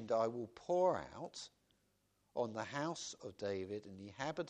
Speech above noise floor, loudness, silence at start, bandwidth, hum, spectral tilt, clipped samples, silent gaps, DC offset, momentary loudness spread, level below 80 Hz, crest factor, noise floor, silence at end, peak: 38 dB; -41 LUFS; 0 s; 10 kHz; none; -5 dB/octave; under 0.1%; none; under 0.1%; 14 LU; -76 dBFS; 20 dB; -79 dBFS; 0 s; -22 dBFS